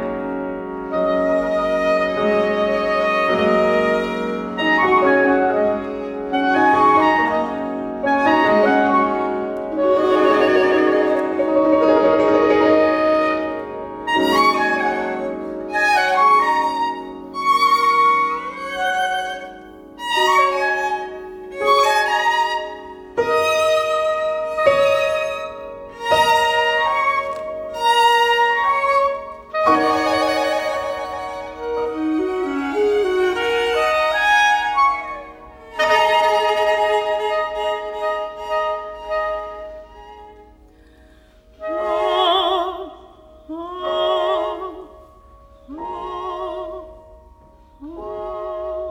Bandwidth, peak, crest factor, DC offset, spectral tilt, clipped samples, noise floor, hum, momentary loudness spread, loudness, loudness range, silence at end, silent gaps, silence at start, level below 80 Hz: 17.5 kHz; -2 dBFS; 16 dB; under 0.1%; -4 dB/octave; under 0.1%; -49 dBFS; none; 14 LU; -18 LUFS; 9 LU; 0 s; none; 0 s; -50 dBFS